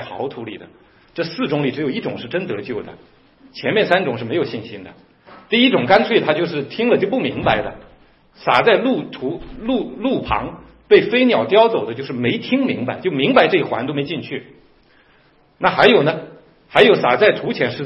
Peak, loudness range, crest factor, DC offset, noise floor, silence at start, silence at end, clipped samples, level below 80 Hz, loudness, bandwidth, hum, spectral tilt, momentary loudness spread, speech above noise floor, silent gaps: 0 dBFS; 6 LU; 18 dB; under 0.1%; -54 dBFS; 0 s; 0 s; under 0.1%; -48 dBFS; -17 LUFS; 6.2 kHz; none; -7.5 dB/octave; 16 LU; 37 dB; none